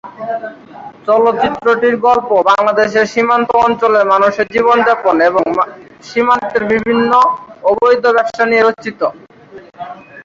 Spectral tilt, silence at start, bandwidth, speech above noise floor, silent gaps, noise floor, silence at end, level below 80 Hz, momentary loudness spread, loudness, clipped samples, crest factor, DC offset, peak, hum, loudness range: -5 dB/octave; 0.05 s; 7.6 kHz; 25 dB; none; -37 dBFS; 0.05 s; -52 dBFS; 12 LU; -12 LUFS; under 0.1%; 12 dB; under 0.1%; 0 dBFS; none; 2 LU